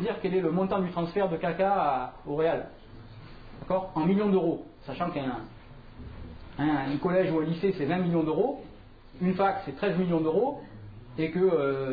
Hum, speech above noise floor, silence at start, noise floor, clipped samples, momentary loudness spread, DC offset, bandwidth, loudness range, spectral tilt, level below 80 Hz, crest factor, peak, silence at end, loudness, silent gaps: none; 22 dB; 0 s; -49 dBFS; under 0.1%; 21 LU; under 0.1%; 5 kHz; 3 LU; -10.5 dB/octave; -52 dBFS; 16 dB; -14 dBFS; 0 s; -28 LUFS; none